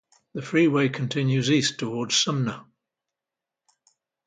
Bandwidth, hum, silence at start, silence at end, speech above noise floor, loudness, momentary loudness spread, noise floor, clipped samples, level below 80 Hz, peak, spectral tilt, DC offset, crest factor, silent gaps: 9.4 kHz; none; 0.35 s; 1.65 s; 65 dB; -23 LUFS; 13 LU; -88 dBFS; under 0.1%; -68 dBFS; -8 dBFS; -4.5 dB/octave; under 0.1%; 18 dB; none